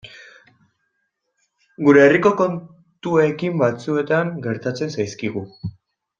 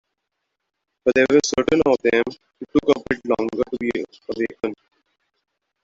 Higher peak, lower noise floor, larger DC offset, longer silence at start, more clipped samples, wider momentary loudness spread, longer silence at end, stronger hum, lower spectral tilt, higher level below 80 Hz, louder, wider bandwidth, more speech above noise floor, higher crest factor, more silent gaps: about the same, -2 dBFS vs -4 dBFS; second, -73 dBFS vs -78 dBFS; neither; second, 0.05 s vs 1.05 s; neither; first, 20 LU vs 12 LU; second, 0.5 s vs 1.1 s; neither; first, -7 dB/octave vs -4.5 dB/octave; second, -62 dBFS vs -52 dBFS; about the same, -19 LUFS vs -21 LUFS; about the same, 7.6 kHz vs 7.8 kHz; about the same, 55 dB vs 58 dB; about the same, 18 dB vs 18 dB; neither